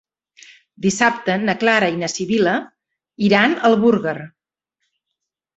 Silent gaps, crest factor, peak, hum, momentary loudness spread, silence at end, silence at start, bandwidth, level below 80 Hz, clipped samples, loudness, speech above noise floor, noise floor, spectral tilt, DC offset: none; 18 dB; -2 dBFS; none; 9 LU; 1.3 s; 0.8 s; 8.2 kHz; -60 dBFS; under 0.1%; -17 LUFS; 63 dB; -80 dBFS; -4.5 dB/octave; under 0.1%